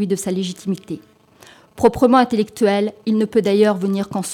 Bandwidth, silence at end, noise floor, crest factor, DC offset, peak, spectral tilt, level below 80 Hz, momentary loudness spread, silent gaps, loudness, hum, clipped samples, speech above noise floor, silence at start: 15.5 kHz; 0 s; -47 dBFS; 16 dB; under 0.1%; -2 dBFS; -5.5 dB/octave; -50 dBFS; 12 LU; none; -18 LUFS; none; under 0.1%; 30 dB; 0 s